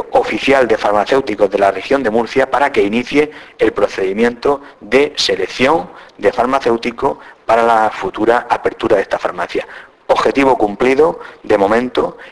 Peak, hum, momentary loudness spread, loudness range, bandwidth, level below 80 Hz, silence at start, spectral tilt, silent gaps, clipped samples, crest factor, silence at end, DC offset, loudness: 0 dBFS; none; 7 LU; 2 LU; 11 kHz; -44 dBFS; 0 s; -4.5 dB/octave; none; under 0.1%; 14 dB; 0 s; under 0.1%; -14 LUFS